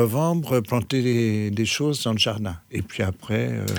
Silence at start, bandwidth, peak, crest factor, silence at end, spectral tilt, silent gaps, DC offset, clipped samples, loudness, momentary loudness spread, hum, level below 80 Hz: 0 s; over 20 kHz; -6 dBFS; 16 dB; 0 s; -5.5 dB/octave; none; under 0.1%; under 0.1%; -23 LUFS; 8 LU; none; -52 dBFS